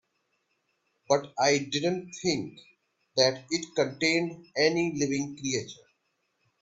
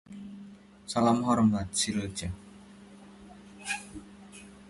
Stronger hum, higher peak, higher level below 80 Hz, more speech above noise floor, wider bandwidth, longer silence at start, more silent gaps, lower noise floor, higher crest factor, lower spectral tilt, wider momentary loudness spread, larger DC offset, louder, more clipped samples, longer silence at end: neither; first, -8 dBFS vs -12 dBFS; second, -68 dBFS vs -54 dBFS; first, 48 dB vs 24 dB; second, 8 kHz vs 11.5 kHz; first, 1.1 s vs 0.1 s; neither; first, -76 dBFS vs -51 dBFS; about the same, 22 dB vs 20 dB; about the same, -3.5 dB/octave vs -4.5 dB/octave; second, 8 LU vs 26 LU; neither; about the same, -28 LUFS vs -29 LUFS; neither; first, 0.9 s vs 0 s